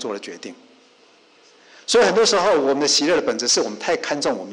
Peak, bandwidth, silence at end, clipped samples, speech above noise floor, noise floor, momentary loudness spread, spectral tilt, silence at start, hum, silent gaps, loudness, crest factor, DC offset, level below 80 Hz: -8 dBFS; 11 kHz; 0 s; under 0.1%; 34 dB; -53 dBFS; 18 LU; -2 dB/octave; 0 s; none; none; -18 LUFS; 12 dB; under 0.1%; -60 dBFS